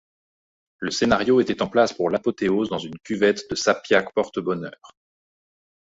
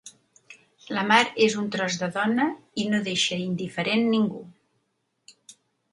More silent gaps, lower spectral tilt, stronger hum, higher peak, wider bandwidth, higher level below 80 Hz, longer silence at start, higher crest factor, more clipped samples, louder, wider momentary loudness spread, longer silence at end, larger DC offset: neither; about the same, -4.5 dB/octave vs -4 dB/octave; neither; about the same, -4 dBFS vs -4 dBFS; second, 7.8 kHz vs 11.5 kHz; first, -54 dBFS vs -70 dBFS; first, 0.8 s vs 0.05 s; about the same, 20 dB vs 22 dB; neither; about the same, -22 LUFS vs -24 LUFS; about the same, 11 LU vs 9 LU; first, 1.05 s vs 0.4 s; neither